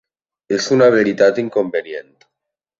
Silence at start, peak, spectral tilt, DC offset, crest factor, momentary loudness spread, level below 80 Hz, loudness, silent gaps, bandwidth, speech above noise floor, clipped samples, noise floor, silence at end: 0.5 s; -2 dBFS; -5 dB/octave; under 0.1%; 16 dB; 14 LU; -62 dBFS; -16 LUFS; none; 7.8 kHz; 66 dB; under 0.1%; -81 dBFS; 0.8 s